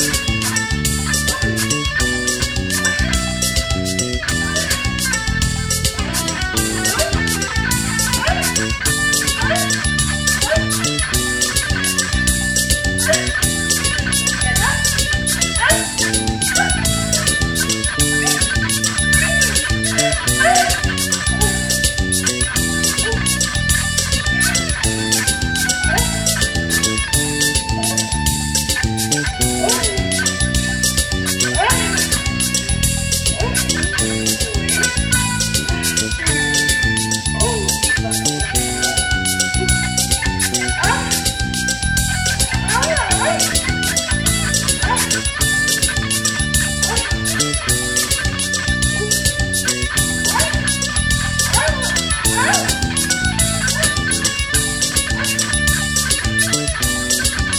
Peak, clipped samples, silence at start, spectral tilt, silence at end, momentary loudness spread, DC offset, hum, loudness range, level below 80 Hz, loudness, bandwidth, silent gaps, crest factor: 0 dBFS; under 0.1%; 0 s; -2.5 dB/octave; 0 s; 3 LU; under 0.1%; none; 2 LU; -26 dBFS; -16 LUFS; over 20 kHz; none; 16 dB